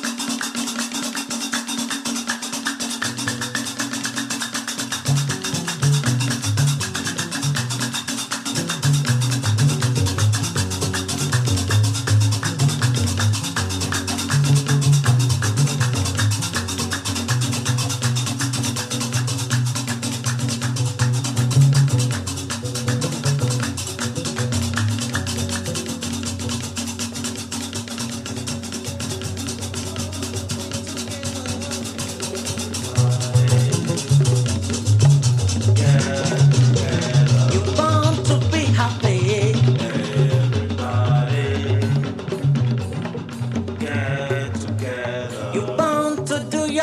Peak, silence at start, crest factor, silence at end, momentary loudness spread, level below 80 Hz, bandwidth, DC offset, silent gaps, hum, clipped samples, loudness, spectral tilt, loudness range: -4 dBFS; 0 s; 16 dB; 0 s; 9 LU; -52 dBFS; 15 kHz; under 0.1%; none; none; under 0.1%; -21 LUFS; -4.5 dB/octave; 8 LU